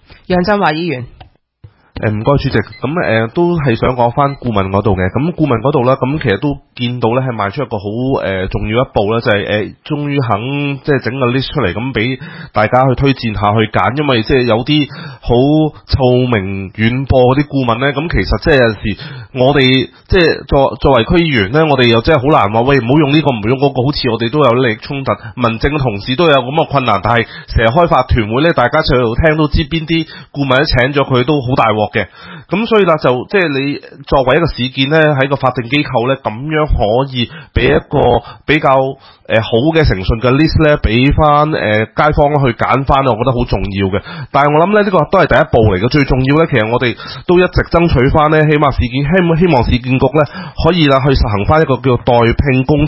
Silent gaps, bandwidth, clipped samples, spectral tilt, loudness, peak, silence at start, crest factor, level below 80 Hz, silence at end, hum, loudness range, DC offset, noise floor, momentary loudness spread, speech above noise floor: none; 6.6 kHz; 0.1%; -8.5 dB/octave; -12 LUFS; 0 dBFS; 0.3 s; 12 dB; -26 dBFS; 0 s; none; 4 LU; under 0.1%; -43 dBFS; 7 LU; 31 dB